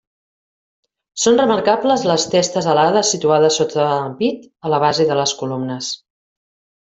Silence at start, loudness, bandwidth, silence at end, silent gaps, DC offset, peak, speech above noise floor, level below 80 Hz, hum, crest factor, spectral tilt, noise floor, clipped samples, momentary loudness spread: 1.15 s; -16 LUFS; 8.4 kHz; 0.9 s; none; under 0.1%; -2 dBFS; over 74 dB; -60 dBFS; none; 16 dB; -3.5 dB/octave; under -90 dBFS; under 0.1%; 9 LU